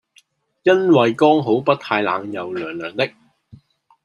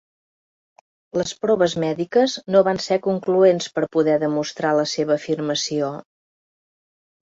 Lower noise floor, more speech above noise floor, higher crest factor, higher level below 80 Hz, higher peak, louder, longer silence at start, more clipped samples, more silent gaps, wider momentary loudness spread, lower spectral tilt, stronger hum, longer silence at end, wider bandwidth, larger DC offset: second, -57 dBFS vs under -90 dBFS; second, 40 dB vs over 70 dB; about the same, 18 dB vs 18 dB; about the same, -66 dBFS vs -64 dBFS; about the same, -2 dBFS vs -4 dBFS; about the same, -18 LUFS vs -20 LUFS; second, 0.65 s vs 1.15 s; neither; neither; first, 13 LU vs 8 LU; first, -6.5 dB/octave vs -5 dB/octave; neither; second, 0.95 s vs 1.35 s; first, 10.5 kHz vs 8 kHz; neither